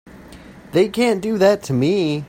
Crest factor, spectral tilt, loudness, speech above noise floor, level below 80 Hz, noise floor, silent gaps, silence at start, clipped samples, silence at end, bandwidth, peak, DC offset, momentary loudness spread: 16 dB; -6 dB/octave; -18 LUFS; 24 dB; -50 dBFS; -40 dBFS; none; 0.05 s; under 0.1%; 0 s; 16.5 kHz; -2 dBFS; under 0.1%; 3 LU